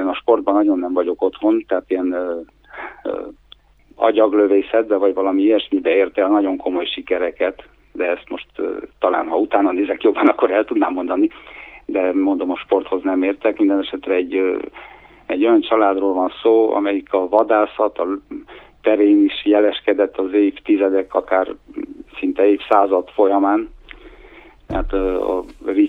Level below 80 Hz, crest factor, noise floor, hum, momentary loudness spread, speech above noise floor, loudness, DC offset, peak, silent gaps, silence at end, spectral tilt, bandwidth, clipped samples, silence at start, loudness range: -44 dBFS; 18 dB; -48 dBFS; none; 12 LU; 31 dB; -18 LUFS; under 0.1%; 0 dBFS; none; 0 s; -7.5 dB/octave; 4.1 kHz; under 0.1%; 0 s; 3 LU